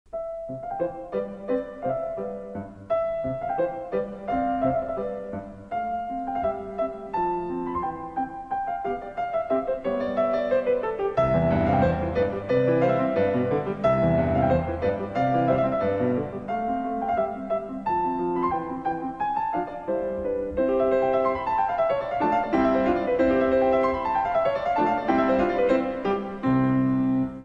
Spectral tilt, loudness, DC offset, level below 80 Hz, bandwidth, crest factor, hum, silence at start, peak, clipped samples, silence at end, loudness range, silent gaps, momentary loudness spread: -9 dB/octave; -25 LUFS; under 0.1%; -46 dBFS; 7.2 kHz; 14 dB; none; 0.15 s; -10 dBFS; under 0.1%; 0 s; 6 LU; none; 9 LU